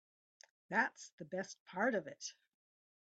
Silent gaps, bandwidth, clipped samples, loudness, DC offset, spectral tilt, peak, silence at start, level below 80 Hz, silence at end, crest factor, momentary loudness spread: 1.12-1.18 s, 1.60-1.66 s; 8.8 kHz; under 0.1%; -40 LUFS; under 0.1%; -3.5 dB/octave; -20 dBFS; 0.7 s; -88 dBFS; 0.85 s; 22 dB; 13 LU